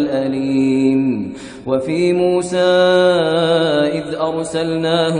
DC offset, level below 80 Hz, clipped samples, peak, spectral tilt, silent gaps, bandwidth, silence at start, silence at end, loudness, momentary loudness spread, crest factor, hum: under 0.1%; -52 dBFS; under 0.1%; -2 dBFS; -5.5 dB/octave; none; 10 kHz; 0 s; 0 s; -16 LUFS; 8 LU; 14 dB; none